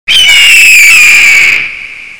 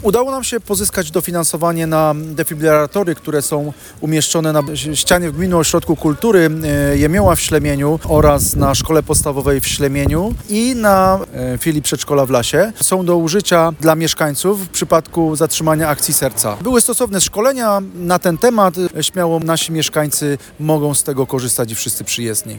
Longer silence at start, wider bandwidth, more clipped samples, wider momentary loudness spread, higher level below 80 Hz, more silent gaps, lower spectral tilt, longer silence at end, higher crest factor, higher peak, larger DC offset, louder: about the same, 0.05 s vs 0 s; about the same, over 20 kHz vs 19.5 kHz; first, 30% vs under 0.1%; first, 13 LU vs 6 LU; second, -38 dBFS vs -32 dBFS; neither; second, 2.5 dB/octave vs -4 dB/octave; about the same, 0 s vs 0 s; second, 4 dB vs 14 dB; about the same, 0 dBFS vs 0 dBFS; neither; first, 0 LUFS vs -15 LUFS